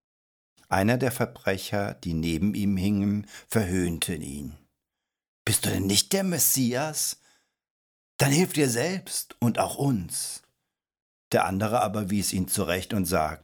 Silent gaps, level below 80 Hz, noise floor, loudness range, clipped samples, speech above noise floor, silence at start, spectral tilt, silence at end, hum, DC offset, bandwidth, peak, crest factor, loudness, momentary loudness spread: 5.28-5.45 s, 7.70-8.19 s, 11.02-11.31 s; -52 dBFS; -87 dBFS; 3 LU; under 0.1%; 61 dB; 0.7 s; -4 dB/octave; 0.05 s; none; under 0.1%; over 20 kHz; -6 dBFS; 22 dB; -26 LUFS; 9 LU